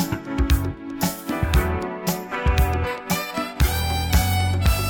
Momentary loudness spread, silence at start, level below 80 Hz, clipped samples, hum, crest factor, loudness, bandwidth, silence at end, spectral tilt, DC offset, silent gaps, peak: 5 LU; 0 s; -26 dBFS; under 0.1%; none; 18 dB; -23 LUFS; 18 kHz; 0 s; -5 dB/octave; under 0.1%; none; -4 dBFS